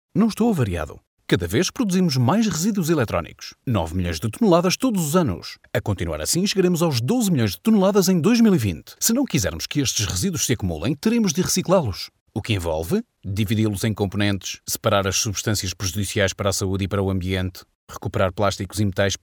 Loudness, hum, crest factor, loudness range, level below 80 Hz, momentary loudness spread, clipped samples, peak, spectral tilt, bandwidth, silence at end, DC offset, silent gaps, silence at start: -21 LUFS; none; 18 dB; 4 LU; -44 dBFS; 9 LU; under 0.1%; -4 dBFS; -5 dB/octave; over 20 kHz; 0.05 s; under 0.1%; 1.07-1.17 s, 12.21-12.26 s, 17.75-17.87 s; 0.15 s